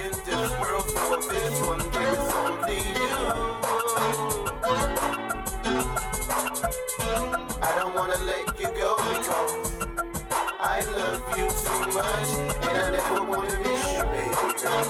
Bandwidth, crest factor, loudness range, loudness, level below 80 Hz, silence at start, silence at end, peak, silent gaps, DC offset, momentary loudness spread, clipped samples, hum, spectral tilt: 19 kHz; 14 dB; 1 LU; -27 LUFS; -38 dBFS; 0 s; 0 s; -12 dBFS; none; under 0.1%; 4 LU; under 0.1%; none; -3 dB/octave